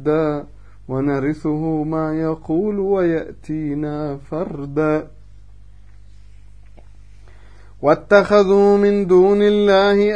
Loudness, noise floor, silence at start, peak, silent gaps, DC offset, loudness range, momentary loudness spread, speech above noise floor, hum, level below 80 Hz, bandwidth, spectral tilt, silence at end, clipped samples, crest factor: -17 LUFS; -44 dBFS; 0 s; 0 dBFS; none; 0.9%; 12 LU; 13 LU; 28 dB; 50 Hz at -45 dBFS; -44 dBFS; 8.8 kHz; -7.5 dB/octave; 0 s; under 0.1%; 18 dB